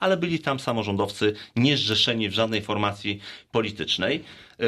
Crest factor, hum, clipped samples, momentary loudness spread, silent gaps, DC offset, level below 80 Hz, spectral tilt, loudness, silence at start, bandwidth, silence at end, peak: 18 dB; none; under 0.1%; 8 LU; none; under 0.1%; -60 dBFS; -5 dB/octave; -24 LUFS; 0 s; 15 kHz; 0 s; -8 dBFS